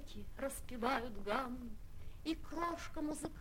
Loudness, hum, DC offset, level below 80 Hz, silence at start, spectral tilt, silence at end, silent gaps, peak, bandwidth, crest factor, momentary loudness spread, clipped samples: -42 LUFS; none; under 0.1%; -52 dBFS; 0 s; -4.5 dB/octave; 0 s; none; -20 dBFS; 16.5 kHz; 22 dB; 14 LU; under 0.1%